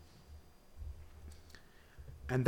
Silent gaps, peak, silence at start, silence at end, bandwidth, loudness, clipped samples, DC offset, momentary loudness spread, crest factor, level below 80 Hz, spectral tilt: none; -14 dBFS; 0 s; 0 s; 16 kHz; -50 LUFS; under 0.1%; under 0.1%; 9 LU; 28 dB; -54 dBFS; -7.5 dB/octave